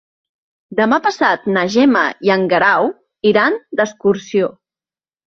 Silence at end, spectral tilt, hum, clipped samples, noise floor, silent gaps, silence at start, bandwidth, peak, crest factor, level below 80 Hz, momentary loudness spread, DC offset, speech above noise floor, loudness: 0.8 s; -5.5 dB/octave; none; under 0.1%; under -90 dBFS; none; 0.7 s; 7.4 kHz; -2 dBFS; 14 dB; -60 dBFS; 6 LU; under 0.1%; over 76 dB; -15 LUFS